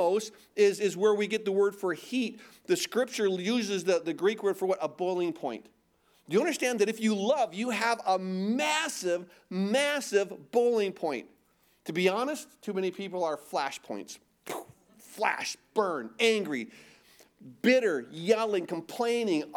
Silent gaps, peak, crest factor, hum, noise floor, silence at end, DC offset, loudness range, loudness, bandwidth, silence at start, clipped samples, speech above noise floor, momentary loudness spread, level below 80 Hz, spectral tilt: none; -10 dBFS; 20 dB; none; -68 dBFS; 0 s; under 0.1%; 4 LU; -29 LUFS; 18 kHz; 0 s; under 0.1%; 38 dB; 12 LU; -80 dBFS; -4 dB/octave